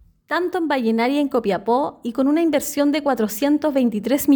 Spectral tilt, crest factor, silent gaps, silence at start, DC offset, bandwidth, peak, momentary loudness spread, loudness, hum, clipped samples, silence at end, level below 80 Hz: -4.5 dB/octave; 14 dB; none; 0.3 s; under 0.1%; over 20 kHz; -6 dBFS; 4 LU; -20 LUFS; none; under 0.1%; 0 s; -58 dBFS